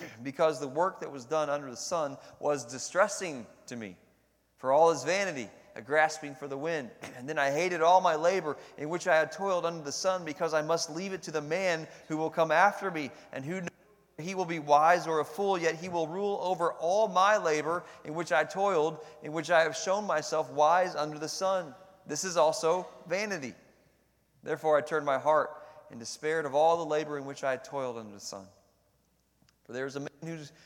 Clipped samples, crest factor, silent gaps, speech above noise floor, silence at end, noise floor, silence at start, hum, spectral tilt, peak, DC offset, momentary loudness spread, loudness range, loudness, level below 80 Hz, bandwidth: under 0.1%; 22 dB; none; 41 dB; 0.15 s; -71 dBFS; 0 s; none; -3.5 dB/octave; -10 dBFS; under 0.1%; 16 LU; 4 LU; -30 LUFS; -78 dBFS; 16.5 kHz